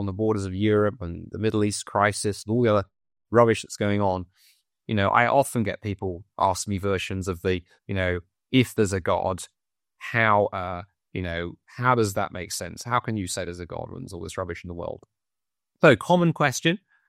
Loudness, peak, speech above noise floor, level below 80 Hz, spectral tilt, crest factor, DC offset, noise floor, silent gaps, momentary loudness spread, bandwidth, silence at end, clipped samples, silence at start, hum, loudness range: -24 LUFS; -4 dBFS; 66 dB; -54 dBFS; -5.5 dB/octave; 22 dB; under 0.1%; -90 dBFS; none; 15 LU; 16 kHz; 0.3 s; under 0.1%; 0 s; none; 4 LU